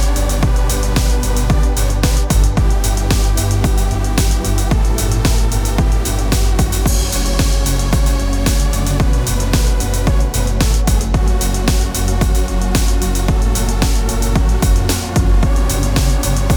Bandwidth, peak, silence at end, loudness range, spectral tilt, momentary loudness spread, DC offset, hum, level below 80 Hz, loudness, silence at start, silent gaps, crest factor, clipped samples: over 20 kHz; 0 dBFS; 0 s; 1 LU; -5 dB/octave; 2 LU; under 0.1%; none; -14 dBFS; -16 LUFS; 0 s; none; 12 dB; under 0.1%